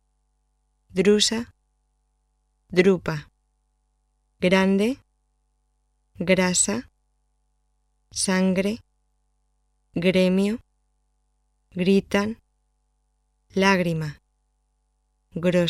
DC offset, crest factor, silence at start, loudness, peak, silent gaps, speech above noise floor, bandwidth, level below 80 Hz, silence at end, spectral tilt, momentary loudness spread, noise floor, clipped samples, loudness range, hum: under 0.1%; 20 dB; 0.95 s; -22 LUFS; -4 dBFS; none; 49 dB; 14 kHz; -56 dBFS; 0 s; -4.5 dB/octave; 15 LU; -70 dBFS; under 0.1%; 3 LU; 50 Hz at -55 dBFS